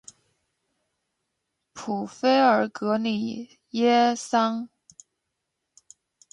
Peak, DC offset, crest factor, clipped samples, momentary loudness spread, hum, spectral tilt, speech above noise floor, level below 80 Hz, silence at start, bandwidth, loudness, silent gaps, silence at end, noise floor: -8 dBFS; under 0.1%; 20 dB; under 0.1%; 15 LU; none; -4.5 dB/octave; 58 dB; -74 dBFS; 1.75 s; 11 kHz; -24 LUFS; none; 1.65 s; -81 dBFS